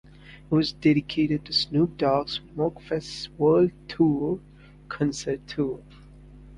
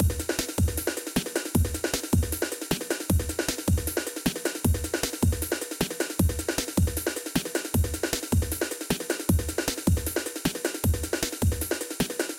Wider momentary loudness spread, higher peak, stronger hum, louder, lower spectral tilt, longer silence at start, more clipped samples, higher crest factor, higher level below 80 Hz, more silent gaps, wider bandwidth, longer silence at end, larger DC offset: first, 10 LU vs 3 LU; about the same, -8 dBFS vs -8 dBFS; first, 50 Hz at -45 dBFS vs none; first, -25 LUFS vs -28 LUFS; first, -6 dB/octave vs -4.5 dB/octave; first, 0.25 s vs 0 s; neither; about the same, 18 dB vs 20 dB; second, -52 dBFS vs -36 dBFS; neither; second, 11 kHz vs 17 kHz; about the same, 0 s vs 0 s; neither